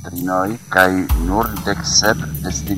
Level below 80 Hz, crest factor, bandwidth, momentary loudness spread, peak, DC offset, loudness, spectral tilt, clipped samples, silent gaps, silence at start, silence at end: -26 dBFS; 18 dB; 16.5 kHz; 8 LU; 0 dBFS; 0.3%; -17 LUFS; -3.5 dB/octave; under 0.1%; none; 0 s; 0 s